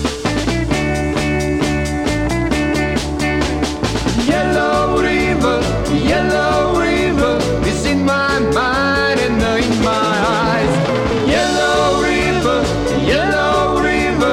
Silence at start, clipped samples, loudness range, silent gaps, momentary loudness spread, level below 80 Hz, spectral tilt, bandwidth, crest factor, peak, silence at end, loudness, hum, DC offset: 0 s; under 0.1%; 2 LU; none; 3 LU; -28 dBFS; -5 dB/octave; 16 kHz; 12 dB; -2 dBFS; 0 s; -15 LUFS; none; under 0.1%